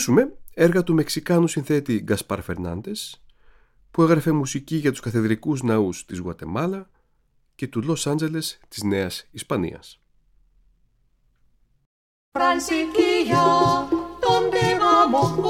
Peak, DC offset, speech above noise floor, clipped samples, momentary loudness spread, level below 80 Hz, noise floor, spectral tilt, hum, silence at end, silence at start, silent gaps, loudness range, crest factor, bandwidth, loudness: -4 dBFS; under 0.1%; 42 dB; under 0.1%; 13 LU; -52 dBFS; -64 dBFS; -5.5 dB/octave; none; 0 s; 0 s; 11.86-12.32 s; 9 LU; 18 dB; 17 kHz; -22 LUFS